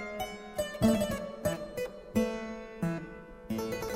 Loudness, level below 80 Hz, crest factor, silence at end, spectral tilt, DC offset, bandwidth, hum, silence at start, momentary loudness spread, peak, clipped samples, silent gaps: -34 LUFS; -52 dBFS; 20 dB; 0 s; -5.5 dB/octave; under 0.1%; 16 kHz; none; 0 s; 12 LU; -12 dBFS; under 0.1%; none